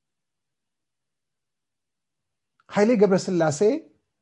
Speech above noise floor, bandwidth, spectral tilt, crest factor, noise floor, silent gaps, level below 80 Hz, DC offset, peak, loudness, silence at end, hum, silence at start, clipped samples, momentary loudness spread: 67 dB; 10.5 kHz; -6 dB/octave; 20 dB; -87 dBFS; none; -72 dBFS; under 0.1%; -6 dBFS; -22 LUFS; 0.4 s; none; 2.7 s; under 0.1%; 9 LU